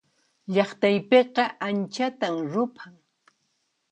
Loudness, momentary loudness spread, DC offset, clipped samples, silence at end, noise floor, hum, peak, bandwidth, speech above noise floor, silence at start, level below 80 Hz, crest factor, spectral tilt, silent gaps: -24 LUFS; 9 LU; under 0.1%; under 0.1%; 1 s; -74 dBFS; none; -6 dBFS; 8.8 kHz; 50 dB; 0.5 s; -76 dBFS; 20 dB; -6 dB/octave; none